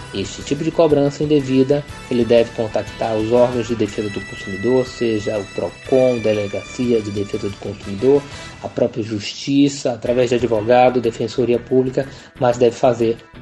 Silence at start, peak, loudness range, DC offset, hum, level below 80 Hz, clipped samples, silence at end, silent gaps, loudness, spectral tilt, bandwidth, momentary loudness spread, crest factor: 0 s; -2 dBFS; 3 LU; under 0.1%; none; -46 dBFS; under 0.1%; 0 s; none; -18 LUFS; -6 dB/octave; 11.5 kHz; 10 LU; 16 dB